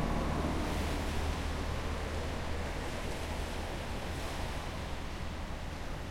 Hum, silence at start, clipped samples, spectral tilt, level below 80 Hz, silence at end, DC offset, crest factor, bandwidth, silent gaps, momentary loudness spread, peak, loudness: none; 0 s; under 0.1%; -5 dB/octave; -40 dBFS; 0 s; under 0.1%; 14 dB; 16.5 kHz; none; 7 LU; -20 dBFS; -38 LUFS